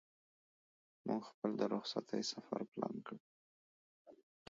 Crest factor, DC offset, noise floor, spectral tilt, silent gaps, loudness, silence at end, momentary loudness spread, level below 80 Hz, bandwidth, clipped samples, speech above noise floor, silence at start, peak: 24 dB; under 0.1%; under -90 dBFS; -4.5 dB/octave; 1.34-1.42 s, 2.68-2.72 s, 3.20-4.05 s; -42 LUFS; 0.35 s; 11 LU; -88 dBFS; 7.4 kHz; under 0.1%; over 48 dB; 1.05 s; -22 dBFS